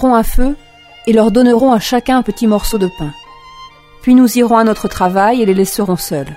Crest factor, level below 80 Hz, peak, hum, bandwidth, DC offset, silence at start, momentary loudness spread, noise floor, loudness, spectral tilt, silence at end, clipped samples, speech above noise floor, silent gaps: 12 dB; -26 dBFS; 0 dBFS; none; 16.5 kHz; under 0.1%; 0 s; 10 LU; -37 dBFS; -12 LUFS; -5.5 dB/octave; 0 s; under 0.1%; 26 dB; none